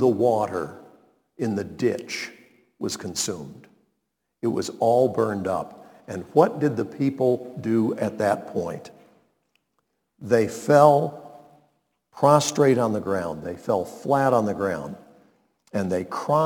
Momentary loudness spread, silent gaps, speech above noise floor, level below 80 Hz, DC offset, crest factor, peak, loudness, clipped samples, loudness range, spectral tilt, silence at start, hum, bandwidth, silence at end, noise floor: 15 LU; none; 55 dB; -64 dBFS; under 0.1%; 22 dB; -2 dBFS; -23 LUFS; under 0.1%; 8 LU; -5.5 dB/octave; 0 s; none; 19 kHz; 0 s; -77 dBFS